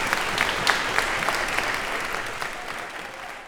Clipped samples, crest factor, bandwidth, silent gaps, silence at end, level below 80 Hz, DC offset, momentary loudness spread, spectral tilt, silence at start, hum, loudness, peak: under 0.1%; 26 dB; over 20 kHz; none; 0 s; -44 dBFS; under 0.1%; 11 LU; -1.5 dB/octave; 0 s; none; -25 LUFS; -2 dBFS